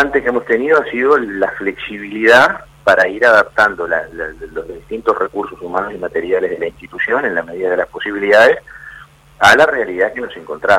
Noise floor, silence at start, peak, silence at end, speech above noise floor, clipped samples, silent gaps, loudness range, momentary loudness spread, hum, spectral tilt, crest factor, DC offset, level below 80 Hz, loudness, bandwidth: -40 dBFS; 0 s; 0 dBFS; 0 s; 25 dB; under 0.1%; none; 6 LU; 16 LU; none; -4 dB/octave; 14 dB; under 0.1%; -46 dBFS; -14 LUFS; 15.5 kHz